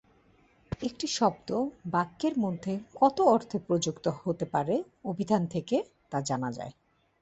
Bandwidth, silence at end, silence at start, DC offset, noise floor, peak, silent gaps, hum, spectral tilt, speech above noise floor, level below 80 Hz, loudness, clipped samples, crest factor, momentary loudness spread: 8.2 kHz; 0.5 s; 0.7 s; under 0.1%; -63 dBFS; -10 dBFS; none; none; -5.5 dB/octave; 34 dB; -60 dBFS; -30 LUFS; under 0.1%; 20 dB; 11 LU